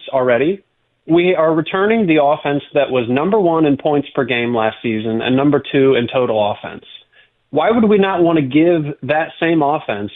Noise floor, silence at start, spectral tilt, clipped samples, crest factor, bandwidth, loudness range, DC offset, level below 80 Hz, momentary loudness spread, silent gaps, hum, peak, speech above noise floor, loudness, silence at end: -53 dBFS; 0 s; -10.5 dB/octave; under 0.1%; 12 dB; 4 kHz; 2 LU; under 0.1%; -54 dBFS; 6 LU; none; none; -2 dBFS; 39 dB; -15 LUFS; 0.05 s